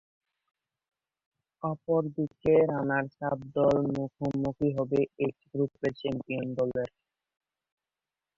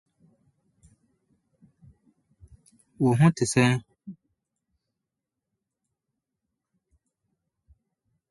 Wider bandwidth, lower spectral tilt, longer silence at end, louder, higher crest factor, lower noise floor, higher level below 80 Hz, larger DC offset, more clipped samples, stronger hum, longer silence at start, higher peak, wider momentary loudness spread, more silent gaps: second, 7.4 kHz vs 11.5 kHz; first, -8.5 dB/octave vs -6 dB/octave; second, 1.5 s vs 4.2 s; second, -30 LUFS vs -23 LUFS; second, 18 dB vs 24 dB; first, under -90 dBFS vs -86 dBFS; about the same, -60 dBFS vs -62 dBFS; neither; neither; neither; second, 1.65 s vs 3 s; second, -12 dBFS vs -6 dBFS; second, 10 LU vs 26 LU; neither